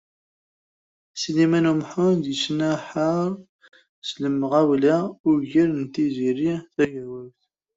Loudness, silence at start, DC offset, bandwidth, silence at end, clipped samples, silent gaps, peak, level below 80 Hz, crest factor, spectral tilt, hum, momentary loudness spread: -22 LUFS; 1.15 s; under 0.1%; 8 kHz; 0.5 s; under 0.1%; 3.49-3.59 s, 3.89-4.02 s, 5.20-5.24 s; -8 dBFS; -64 dBFS; 16 dB; -6 dB/octave; none; 15 LU